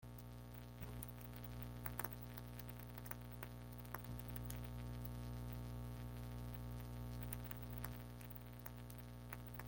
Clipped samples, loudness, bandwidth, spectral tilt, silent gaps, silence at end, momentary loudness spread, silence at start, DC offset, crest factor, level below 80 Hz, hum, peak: under 0.1%; -51 LUFS; 17 kHz; -6 dB/octave; none; 0 s; 5 LU; 0 s; under 0.1%; 26 dB; -56 dBFS; 60 Hz at -50 dBFS; -24 dBFS